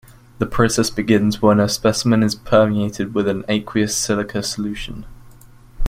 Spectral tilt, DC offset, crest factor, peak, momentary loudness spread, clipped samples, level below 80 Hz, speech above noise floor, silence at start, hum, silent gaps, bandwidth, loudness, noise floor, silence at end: -5 dB/octave; under 0.1%; 18 dB; 0 dBFS; 10 LU; under 0.1%; -38 dBFS; 26 dB; 0.4 s; none; none; 16 kHz; -18 LUFS; -44 dBFS; 0 s